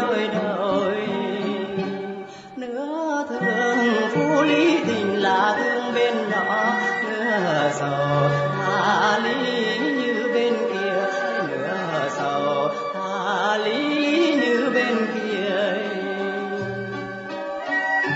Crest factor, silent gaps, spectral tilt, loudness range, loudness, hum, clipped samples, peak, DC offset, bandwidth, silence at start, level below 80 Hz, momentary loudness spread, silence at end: 16 dB; none; -5.5 dB/octave; 4 LU; -22 LUFS; none; under 0.1%; -6 dBFS; under 0.1%; 8 kHz; 0 s; -64 dBFS; 9 LU; 0 s